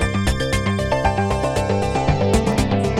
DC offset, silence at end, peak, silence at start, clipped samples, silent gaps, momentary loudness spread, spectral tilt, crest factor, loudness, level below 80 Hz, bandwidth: under 0.1%; 0 s; -4 dBFS; 0 s; under 0.1%; none; 3 LU; -6 dB/octave; 16 dB; -19 LUFS; -28 dBFS; 15 kHz